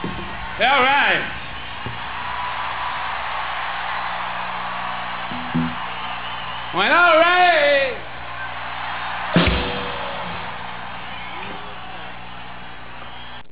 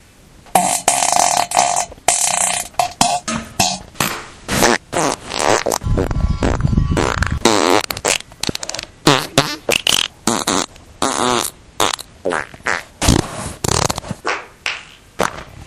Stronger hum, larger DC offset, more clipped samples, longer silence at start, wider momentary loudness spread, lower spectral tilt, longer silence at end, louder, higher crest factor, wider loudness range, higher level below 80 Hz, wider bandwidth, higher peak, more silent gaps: first, 60 Hz at -45 dBFS vs none; first, 2% vs under 0.1%; neither; second, 0 s vs 0.45 s; first, 19 LU vs 9 LU; first, -8 dB/octave vs -3 dB/octave; about the same, 0.1 s vs 0 s; second, -21 LUFS vs -17 LUFS; about the same, 18 dB vs 18 dB; first, 9 LU vs 4 LU; second, -40 dBFS vs -30 dBFS; second, 4 kHz vs over 20 kHz; second, -4 dBFS vs 0 dBFS; neither